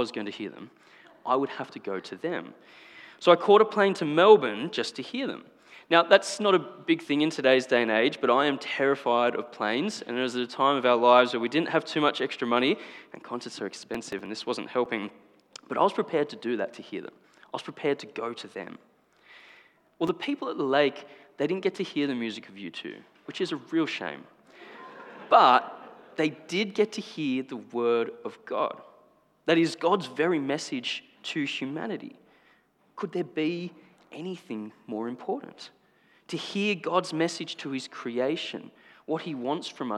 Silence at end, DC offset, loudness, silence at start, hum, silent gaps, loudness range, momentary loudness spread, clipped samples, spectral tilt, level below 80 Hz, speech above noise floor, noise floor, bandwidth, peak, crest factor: 0 s; under 0.1%; -27 LUFS; 0 s; none; none; 11 LU; 18 LU; under 0.1%; -4.5 dB/octave; -80 dBFS; 37 dB; -64 dBFS; 11.5 kHz; -2 dBFS; 26 dB